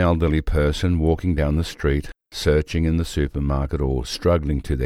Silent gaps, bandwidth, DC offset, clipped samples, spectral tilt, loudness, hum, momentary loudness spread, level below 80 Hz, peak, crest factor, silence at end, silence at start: none; 13.5 kHz; under 0.1%; under 0.1%; -7 dB/octave; -22 LUFS; none; 4 LU; -26 dBFS; -4 dBFS; 16 dB; 0 s; 0 s